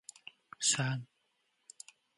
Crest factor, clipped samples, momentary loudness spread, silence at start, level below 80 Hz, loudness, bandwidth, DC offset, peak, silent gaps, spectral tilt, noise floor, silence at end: 22 dB; under 0.1%; 23 LU; 0.6 s; -80 dBFS; -32 LUFS; 11.5 kHz; under 0.1%; -16 dBFS; none; -2 dB/octave; -78 dBFS; 1.1 s